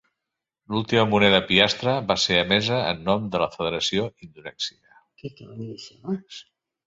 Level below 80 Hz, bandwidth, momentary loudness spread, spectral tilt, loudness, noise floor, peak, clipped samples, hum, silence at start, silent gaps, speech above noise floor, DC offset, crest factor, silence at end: -54 dBFS; 7.8 kHz; 22 LU; -4.5 dB/octave; -22 LUFS; -85 dBFS; -2 dBFS; under 0.1%; none; 0.7 s; none; 61 dB; under 0.1%; 24 dB; 0.45 s